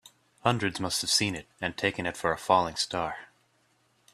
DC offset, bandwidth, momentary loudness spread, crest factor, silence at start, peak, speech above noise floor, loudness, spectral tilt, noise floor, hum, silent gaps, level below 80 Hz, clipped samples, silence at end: under 0.1%; 15.5 kHz; 9 LU; 24 dB; 0.45 s; -8 dBFS; 40 dB; -28 LUFS; -3 dB/octave; -69 dBFS; none; none; -62 dBFS; under 0.1%; 0.9 s